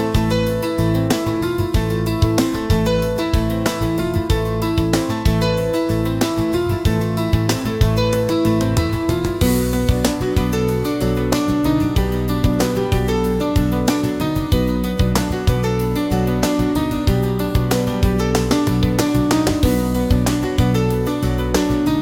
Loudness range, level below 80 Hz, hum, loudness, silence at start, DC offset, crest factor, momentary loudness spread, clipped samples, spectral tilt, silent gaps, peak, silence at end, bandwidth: 1 LU; -26 dBFS; none; -18 LUFS; 0 s; 0.1%; 16 dB; 3 LU; under 0.1%; -6 dB/octave; none; -2 dBFS; 0 s; 17 kHz